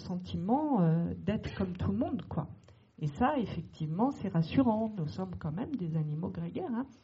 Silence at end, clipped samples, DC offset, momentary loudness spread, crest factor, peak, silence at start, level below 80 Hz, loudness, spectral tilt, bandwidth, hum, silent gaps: 0.1 s; under 0.1%; under 0.1%; 10 LU; 18 dB; -16 dBFS; 0 s; -56 dBFS; -33 LUFS; -7.5 dB/octave; 7.4 kHz; none; none